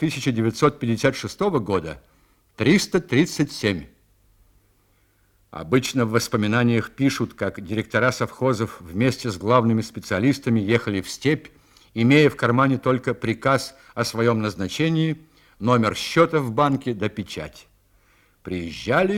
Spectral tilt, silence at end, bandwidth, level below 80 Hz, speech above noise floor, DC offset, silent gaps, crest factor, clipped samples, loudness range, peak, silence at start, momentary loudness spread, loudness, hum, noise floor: -6 dB/octave; 0 s; 17 kHz; -54 dBFS; 40 dB; under 0.1%; none; 20 dB; under 0.1%; 4 LU; -2 dBFS; 0 s; 10 LU; -22 LUFS; none; -62 dBFS